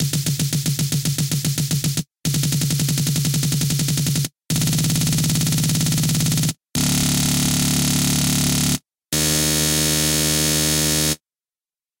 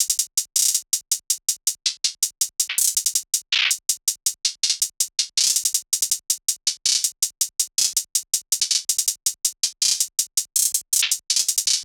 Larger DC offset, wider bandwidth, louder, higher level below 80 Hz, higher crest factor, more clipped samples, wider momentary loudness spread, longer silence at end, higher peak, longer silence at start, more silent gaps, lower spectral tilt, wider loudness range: neither; second, 17 kHz vs over 20 kHz; about the same, -19 LUFS vs -20 LUFS; first, -40 dBFS vs -76 dBFS; second, 14 dB vs 22 dB; neither; about the same, 5 LU vs 4 LU; first, 0.85 s vs 0 s; second, -6 dBFS vs -2 dBFS; about the same, 0 s vs 0 s; neither; first, -3.5 dB/octave vs 6 dB/octave; about the same, 3 LU vs 1 LU